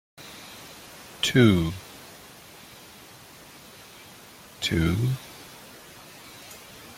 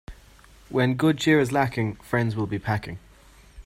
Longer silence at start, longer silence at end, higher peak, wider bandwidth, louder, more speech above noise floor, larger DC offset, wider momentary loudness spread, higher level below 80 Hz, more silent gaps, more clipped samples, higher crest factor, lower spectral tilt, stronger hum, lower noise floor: about the same, 0.2 s vs 0.1 s; about the same, 0.05 s vs 0.05 s; about the same, -6 dBFS vs -8 dBFS; about the same, 16.5 kHz vs 15.5 kHz; about the same, -24 LUFS vs -24 LUFS; about the same, 27 dB vs 29 dB; neither; first, 25 LU vs 9 LU; about the same, -52 dBFS vs -50 dBFS; neither; neither; first, 22 dB vs 16 dB; about the same, -5.5 dB/octave vs -6.5 dB/octave; neither; second, -48 dBFS vs -52 dBFS